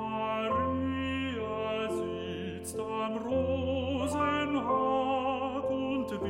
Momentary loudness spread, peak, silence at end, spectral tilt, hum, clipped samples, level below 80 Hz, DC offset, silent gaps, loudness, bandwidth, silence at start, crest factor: 7 LU; -18 dBFS; 0 s; -5.5 dB/octave; none; under 0.1%; -54 dBFS; under 0.1%; none; -32 LUFS; 16 kHz; 0 s; 14 dB